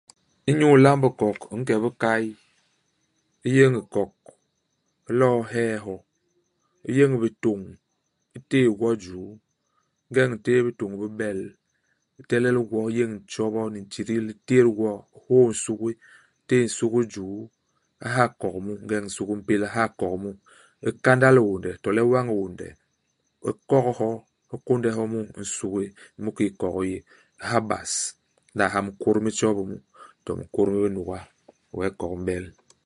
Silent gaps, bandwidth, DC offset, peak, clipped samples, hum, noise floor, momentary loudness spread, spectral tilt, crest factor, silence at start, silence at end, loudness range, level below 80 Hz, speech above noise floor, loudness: none; 11.5 kHz; under 0.1%; -2 dBFS; under 0.1%; none; -75 dBFS; 16 LU; -6 dB/octave; 24 dB; 0.45 s; 0.35 s; 5 LU; -56 dBFS; 52 dB; -24 LUFS